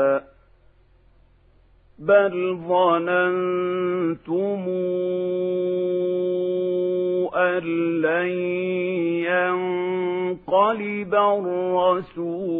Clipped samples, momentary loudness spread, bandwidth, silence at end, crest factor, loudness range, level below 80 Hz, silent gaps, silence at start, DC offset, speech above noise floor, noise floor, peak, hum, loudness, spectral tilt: under 0.1%; 6 LU; 3.9 kHz; 0 s; 18 dB; 2 LU; -64 dBFS; none; 0 s; under 0.1%; 34 dB; -56 dBFS; -6 dBFS; none; -22 LUFS; -10 dB/octave